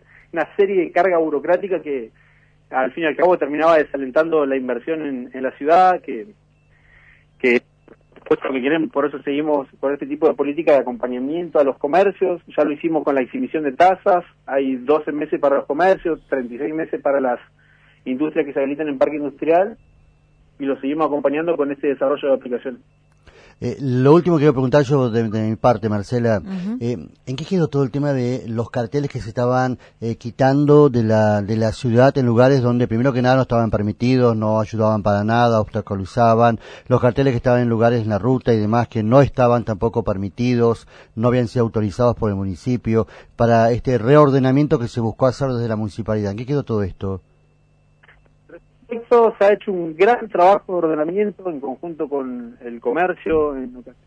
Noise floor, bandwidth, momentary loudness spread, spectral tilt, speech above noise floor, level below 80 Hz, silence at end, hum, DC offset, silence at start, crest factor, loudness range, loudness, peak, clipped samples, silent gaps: -56 dBFS; 9.4 kHz; 11 LU; -8 dB/octave; 38 dB; -46 dBFS; 0.15 s; 50 Hz at -50 dBFS; under 0.1%; 0.35 s; 18 dB; 5 LU; -18 LUFS; 0 dBFS; under 0.1%; none